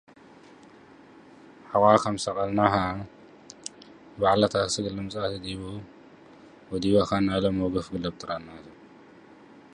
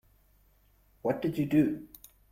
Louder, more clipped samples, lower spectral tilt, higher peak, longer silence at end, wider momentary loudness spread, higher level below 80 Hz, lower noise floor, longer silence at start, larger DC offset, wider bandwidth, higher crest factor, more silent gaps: first, -26 LUFS vs -30 LUFS; neither; second, -5.5 dB/octave vs -8 dB/octave; first, -4 dBFS vs -14 dBFS; first, 0.9 s vs 0.45 s; second, 19 LU vs 22 LU; first, -52 dBFS vs -62 dBFS; second, -51 dBFS vs -65 dBFS; first, 1.65 s vs 1.05 s; neither; second, 11 kHz vs 16 kHz; first, 24 dB vs 18 dB; neither